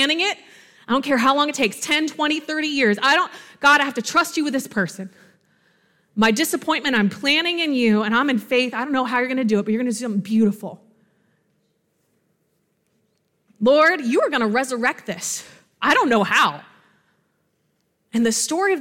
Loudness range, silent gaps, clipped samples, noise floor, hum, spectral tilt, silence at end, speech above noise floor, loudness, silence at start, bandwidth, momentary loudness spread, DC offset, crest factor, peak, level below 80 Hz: 5 LU; none; under 0.1%; -69 dBFS; none; -3.5 dB/octave; 0 s; 49 dB; -19 LUFS; 0 s; 17 kHz; 10 LU; under 0.1%; 16 dB; -4 dBFS; -64 dBFS